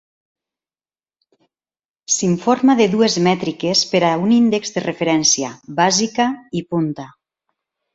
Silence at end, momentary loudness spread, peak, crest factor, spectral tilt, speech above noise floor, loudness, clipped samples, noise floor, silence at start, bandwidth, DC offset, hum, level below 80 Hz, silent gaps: 0.85 s; 9 LU; -2 dBFS; 18 dB; -4 dB/octave; over 73 dB; -17 LUFS; under 0.1%; under -90 dBFS; 2.1 s; 8 kHz; under 0.1%; none; -60 dBFS; none